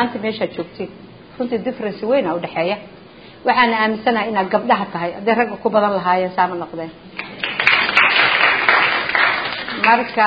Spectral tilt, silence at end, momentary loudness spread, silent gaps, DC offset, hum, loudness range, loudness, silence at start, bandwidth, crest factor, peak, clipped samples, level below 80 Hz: -6 dB/octave; 0 s; 15 LU; none; 0.1%; none; 6 LU; -16 LUFS; 0 s; 8 kHz; 18 dB; 0 dBFS; under 0.1%; -56 dBFS